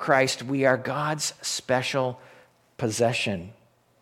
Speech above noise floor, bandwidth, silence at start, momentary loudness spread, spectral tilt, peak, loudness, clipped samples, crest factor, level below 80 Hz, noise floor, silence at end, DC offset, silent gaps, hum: 30 dB; 16.5 kHz; 0 s; 9 LU; -4 dB/octave; -6 dBFS; -26 LUFS; under 0.1%; 22 dB; -66 dBFS; -56 dBFS; 0.5 s; under 0.1%; none; none